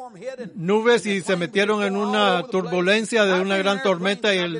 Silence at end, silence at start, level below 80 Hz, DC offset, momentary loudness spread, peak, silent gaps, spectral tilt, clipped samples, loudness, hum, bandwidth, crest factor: 0 s; 0 s; -72 dBFS; under 0.1%; 5 LU; -4 dBFS; none; -4.5 dB/octave; under 0.1%; -20 LUFS; none; 10.5 kHz; 16 dB